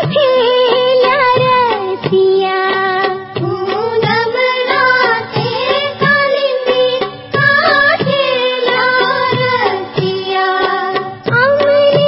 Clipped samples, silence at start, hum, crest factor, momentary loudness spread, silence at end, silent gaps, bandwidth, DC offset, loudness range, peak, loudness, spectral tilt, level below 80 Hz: under 0.1%; 0 s; none; 12 dB; 7 LU; 0 s; none; 5.8 kHz; under 0.1%; 2 LU; 0 dBFS; -12 LUFS; -8 dB/octave; -52 dBFS